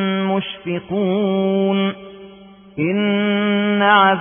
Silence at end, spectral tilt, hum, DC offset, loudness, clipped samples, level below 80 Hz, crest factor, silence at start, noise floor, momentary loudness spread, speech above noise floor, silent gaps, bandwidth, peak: 0 s; -11.5 dB/octave; none; under 0.1%; -18 LUFS; under 0.1%; -60 dBFS; 16 dB; 0 s; -42 dBFS; 12 LU; 25 dB; none; 3.6 kHz; -2 dBFS